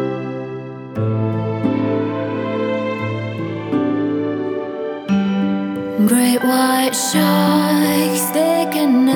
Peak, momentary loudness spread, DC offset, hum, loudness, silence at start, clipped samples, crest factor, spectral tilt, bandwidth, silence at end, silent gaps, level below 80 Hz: -4 dBFS; 10 LU; under 0.1%; none; -18 LUFS; 0 s; under 0.1%; 14 dB; -5 dB/octave; over 20 kHz; 0 s; none; -60 dBFS